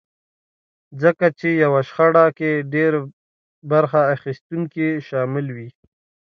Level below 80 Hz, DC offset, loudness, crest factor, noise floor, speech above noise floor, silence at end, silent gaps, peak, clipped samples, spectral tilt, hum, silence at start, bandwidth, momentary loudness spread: -68 dBFS; under 0.1%; -19 LUFS; 18 dB; under -90 dBFS; over 72 dB; 0.6 s; 3.13-3.62 s, 4.41-4.50 s; -2 dBFS; under 0.1%; -9 dB/octave; none; 0.9 s; 6.4 kHz; 11 LU